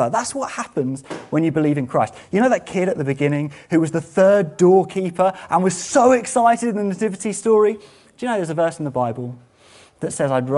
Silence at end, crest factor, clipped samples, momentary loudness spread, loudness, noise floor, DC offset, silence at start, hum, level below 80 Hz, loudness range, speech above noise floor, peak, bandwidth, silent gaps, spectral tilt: 0 s; 16 dB; under 0.1%; 10 LU; -19 LUFS; -49 dBFS; under 0.1%; 0 s; none; -60 dBFS; 5 LU; 31 dB; -2 dBFS; 11.5 kHz; none; -6 dB/octave